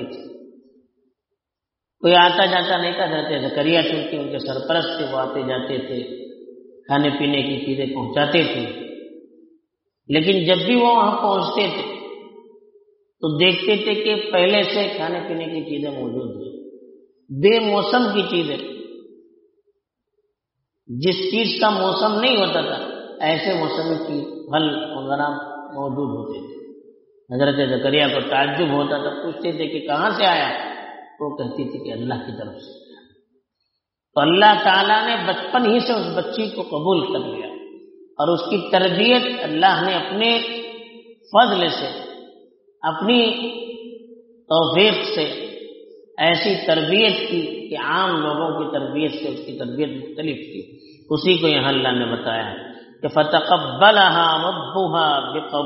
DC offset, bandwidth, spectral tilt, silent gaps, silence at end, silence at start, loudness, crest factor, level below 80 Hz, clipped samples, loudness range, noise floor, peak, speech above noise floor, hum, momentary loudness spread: under 0.1%; 6 kHz; -2 dB/octave; none; 0 s; 0 s; -19 LUFS; 20 dB; -64 dBFS; under 0.1%; 6 LU; -85 dBFS; 0 dBFS; 66 dB; none; 17 LU